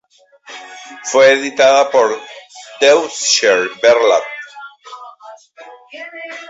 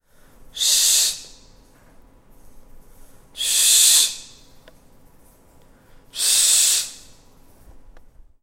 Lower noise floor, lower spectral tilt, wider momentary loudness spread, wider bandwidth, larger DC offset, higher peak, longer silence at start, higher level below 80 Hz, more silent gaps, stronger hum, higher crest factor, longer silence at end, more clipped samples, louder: second, -42 dBFS vs -51 dBFS; first, -1 dB/octave vs 3.5 dB/octave; first, 24 LU vs 21 LU; second, 8 kHz vs 16 kHz; neither; about the same, 0 dBFS vs -2 dBFS; about the same, 0.5 s vs 0.55 s; second, -64 dBFS vs -50 dBFS; neither; neither; second, 16 dB vs 22 dB; second, 0.05 s vs 0.6 s; neither; first, -12 LUFS vs -15 LUFS